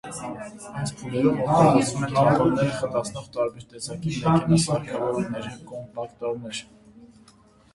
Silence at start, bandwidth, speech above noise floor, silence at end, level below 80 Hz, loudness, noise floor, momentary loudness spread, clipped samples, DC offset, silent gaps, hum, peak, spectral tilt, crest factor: 0.05 s; 11.5 kHz; 31 dB; 0.7 s; -52 dBFS; -24 LUFS; -55 dBFS; 17 LU; under 0.1%; under 0.1%; none; none; -4 dBFS; -6 dB/octave; 20 dB